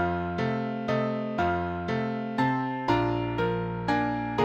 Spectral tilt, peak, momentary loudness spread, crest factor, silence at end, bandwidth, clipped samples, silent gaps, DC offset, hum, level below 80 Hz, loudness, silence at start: -7.5 dB/octave; -12 dBFS; 4 LU; 16 dB; 0 s; 8.8 kHz; under 0.1%; none; under 0.1%; none; -50 dBFS; -28 LUFS; 0 s